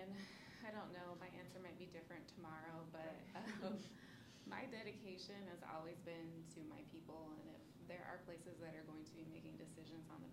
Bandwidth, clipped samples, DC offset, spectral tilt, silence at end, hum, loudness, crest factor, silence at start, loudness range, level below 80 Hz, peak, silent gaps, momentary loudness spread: 16 kHz; under 0.1%; under 0.1%; -5.5 dB/octave; 0 s; none; -55 LUFS; 20 dB; 0 s; 3 LU; -82 dBFS; -34 dBFS; none; 6 LU